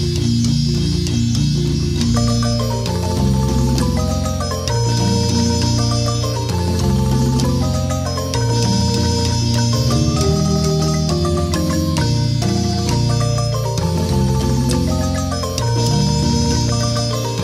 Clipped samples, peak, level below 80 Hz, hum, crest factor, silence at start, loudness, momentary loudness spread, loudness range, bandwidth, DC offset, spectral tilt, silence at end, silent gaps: under 0.1%; -2 dBFS; -28 dBFS; none; 14 dB; 0 s; -17 LUFS; 3 LU; 1 LU; 14.5 kHz; under 0.1%; -5.5 dB/octave; 0 s; none